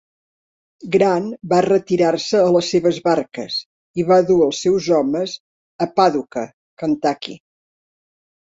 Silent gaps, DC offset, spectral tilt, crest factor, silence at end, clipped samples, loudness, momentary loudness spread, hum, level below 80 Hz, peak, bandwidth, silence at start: 3.65-3.94 s, 5.40-5.79 s, 6.54-6.77 s; under 0.1%; -5.5 dB/octave; 16 dB; 1.1 s; under 0.1%; -18 LUFS; 13 LU; none; -60 dBFS; -2 dBFS; 8 kHz; 0.85 s